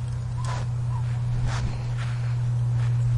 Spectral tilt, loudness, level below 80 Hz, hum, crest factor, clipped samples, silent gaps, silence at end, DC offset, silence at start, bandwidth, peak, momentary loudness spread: -7 dB/octave; -27 LUFS; -38 dBFS; none; 10 dB; under 0.1%; none; 0 s; under 0.1%; 0 s; 10.5 kHz; -16 dBFS; 5 LU